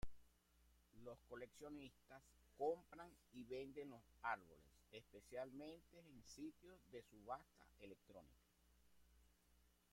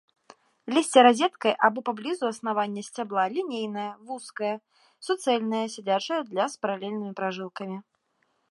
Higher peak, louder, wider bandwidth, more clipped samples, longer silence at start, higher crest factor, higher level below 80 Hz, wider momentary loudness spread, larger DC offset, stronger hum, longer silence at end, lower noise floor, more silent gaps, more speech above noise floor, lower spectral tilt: second, -32 dBFS vs -4 dBFS; second, -55 LUFS vs -26 LUFS; first, 16.5 kHz vs 11.5 kHz; neither; second, 0 s vs 0.65 s; about the same, 24 dB vs 24 dB; first, -72 dBFS vs -84 dBFS; about the same, 17 LU vs 16 LU; neither; neither; second, 0.2 s vs 0.7 s; first, -78 dBFS vs -72 dBFS; neither; second, 23 dB vs 46 dB; about the same, -5 dB/octave vs -4 dB/octave